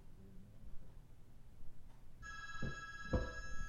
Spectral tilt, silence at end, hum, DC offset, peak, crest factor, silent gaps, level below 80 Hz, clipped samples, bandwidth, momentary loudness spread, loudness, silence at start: -5.5 dB/octave; 0 s; none; under 0.1%; -26 dBFS; 20 dB; none; -52 dBFS; under 0.1%; 7.2 kHz; 22 LU; -46 LUFS; 0 s